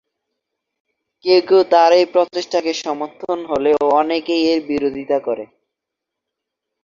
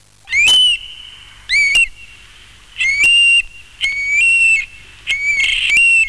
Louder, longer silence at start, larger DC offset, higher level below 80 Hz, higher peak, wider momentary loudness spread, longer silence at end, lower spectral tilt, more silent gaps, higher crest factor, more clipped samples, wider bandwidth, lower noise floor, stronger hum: second, -17 LUFS vs -11 LUFS; first, 1.25 s vs 0.3 s; second, under 0.1% vs 0.4%; second, -60 dBFS vs -42 dBFS; first, 0 dBFS vs -4 dBFS; about the same, 13 LU vs 12 LU; first, 1.4 s vs 0 s; first, -4 dB/octave vs 2.5 dB/octave; neither; first, 18 dB vs 10 dB; neither; second, 7.4 kHz vs 11 kHz; first, -82 dBFS vs -42 dBFS; neither